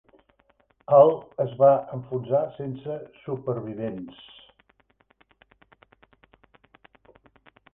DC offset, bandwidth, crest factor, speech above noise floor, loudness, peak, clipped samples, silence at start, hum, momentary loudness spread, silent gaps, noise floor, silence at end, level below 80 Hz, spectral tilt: under 0.1%; 3.8 kHz; 22 dB; 42 dB; -24 LUFS; -4 dBFS; under 0.1%; 0.9 s; none; 20 LU; none; -65 dBFS; 3.65 s; -66 dBFS; -11 dB/octave